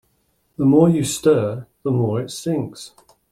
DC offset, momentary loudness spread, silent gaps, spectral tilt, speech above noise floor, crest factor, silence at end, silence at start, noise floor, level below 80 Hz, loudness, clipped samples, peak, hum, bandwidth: under 0.1%; 20 LU; none; -6.5 dB/octave; 47 dB; 16 dB; 0.45 s; 0.6 s; -65 dBFS; -56 dBFS; -19 LUFS; under 0.1%; -2 dBFS; none; 15.5 kHz